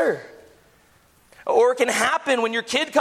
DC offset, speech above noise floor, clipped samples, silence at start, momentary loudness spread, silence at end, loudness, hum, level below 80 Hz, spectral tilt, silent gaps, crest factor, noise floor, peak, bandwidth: under 0.1%; 36 dB; under 0.1%; 0 s; 8 LU; 0 s; -21 LUFS; none; -66 dBFS; -2 dB/octave; none; 18 dB; -57 dBFS; -4 dBFS; 15 kHz